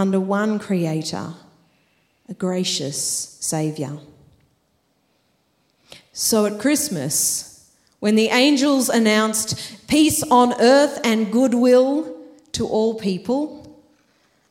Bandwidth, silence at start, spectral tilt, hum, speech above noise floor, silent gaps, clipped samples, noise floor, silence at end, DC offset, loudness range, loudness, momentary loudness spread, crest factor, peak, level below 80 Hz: 16.5 kHz; 0 s; -4 dB/octave; none; 47 dB; none; under 0.1%; -66 dBFS; 0.8 s; under 0.1%; 9 LU; -19 LUFS; 15 LU; 18 dB; -2 dBFS; -56 dBFS